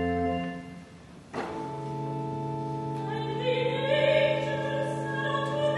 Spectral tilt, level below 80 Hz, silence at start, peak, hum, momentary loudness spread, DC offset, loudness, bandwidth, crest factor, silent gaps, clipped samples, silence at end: -6.5 dB/octave; -58 dBFS; 0 s; -12 dBFS; none; 15 LU; under 0.1%; -29 LUFS; 11.5 kHz; 18 dB; none; under 0.1%; 0 s